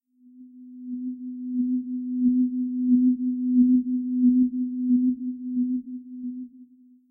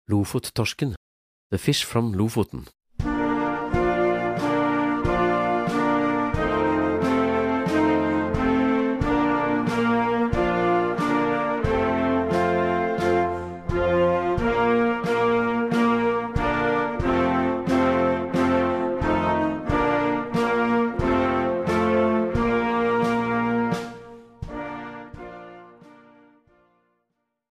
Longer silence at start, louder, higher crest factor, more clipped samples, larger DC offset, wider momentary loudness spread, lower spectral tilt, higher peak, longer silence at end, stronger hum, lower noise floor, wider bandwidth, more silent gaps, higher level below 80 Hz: first, 0.35 s vs 0.1 s; about the same, -24 LUFS vs -23 LUFS; about the same, 14 dB vs 14 dB; neither; neither; first, 15 LU vs 7 LU; first, -14 dB/octave vs -6.5 dB/octave; about the same, -10 dBFS vs -8 dBFS; second, 0.45 s vs 1.85 s; neither; second, -52 dBFS vs -76 dBFS; second, 0.4 kHz vs 15.5 kHz; second, none vs 0.97-1.50 s; second, -66 dBFS vs -40 dBFS